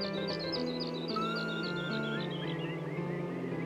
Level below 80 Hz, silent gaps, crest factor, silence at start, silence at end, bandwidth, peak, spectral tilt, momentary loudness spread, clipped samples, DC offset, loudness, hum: -68 dBFS; none; 14 dB; 0 s; 0 s; 12 kHz; -22 dBFS; -6.5 dB/octave; 3 LU; under 0.1%; under 0.1%; -35 LUFS; none